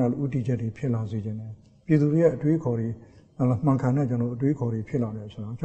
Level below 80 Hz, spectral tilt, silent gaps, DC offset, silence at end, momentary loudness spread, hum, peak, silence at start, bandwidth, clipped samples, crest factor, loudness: -56 dBFS; -10 dB/octave; none; under 0.1%; 0 s; 14 LU; none; -8 dBFS; 0 s; 8.2 kHz; under 0.1%; 18 dB; -26 LUFS